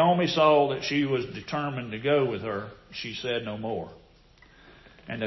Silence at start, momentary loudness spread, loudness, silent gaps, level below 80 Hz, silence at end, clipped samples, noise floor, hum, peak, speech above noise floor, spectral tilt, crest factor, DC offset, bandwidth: 0 s; 15 LU; -27 LUFS; none; -58 dBFS; 0 s; under 0.1%; -56 dBFS; none; -8 dBFS; 29 dB; -6 dB/octave; 18 dB; under 0.1%; 6.2 kHz